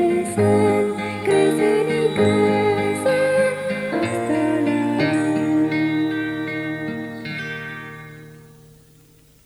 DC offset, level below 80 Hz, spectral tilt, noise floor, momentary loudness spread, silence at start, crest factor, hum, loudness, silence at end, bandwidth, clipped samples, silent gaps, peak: under 0.1%; -58 dBFS; -6 dB/octave; -51 dBFS; 12 LU; 0 s; 14 dB; none; -20 LUFS; 1.05 s; 13.5 kHz; under 0.1%; none; -6 dBFS